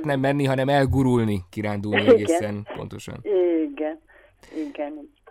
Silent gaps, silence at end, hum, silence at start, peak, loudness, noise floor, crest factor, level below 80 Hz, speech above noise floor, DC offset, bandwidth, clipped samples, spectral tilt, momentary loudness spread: none; 0.25 s; none; 0 s; -6 dBFS; -22 LUFS; -53 dBFS; 18 dB; -48 dBFS; 31 dB; under 0.1%; 15.5 kHz; under 0.1%; -6.5 dB/octave; 17 LU